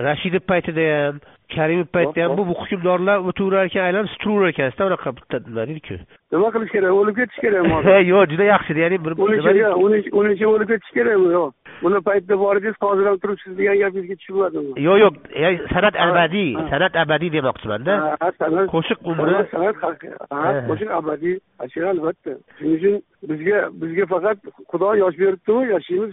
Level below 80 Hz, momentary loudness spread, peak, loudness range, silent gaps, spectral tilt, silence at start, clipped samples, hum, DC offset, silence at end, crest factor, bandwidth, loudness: -50 dBFS; 11 LU; -2 dBFS; 6 LU; none; -4.5 dB/octave; 0 s; under 0.1%; none; under 0.1%; 0 s; 18 dB; 3.9 kHz; -19 LUFS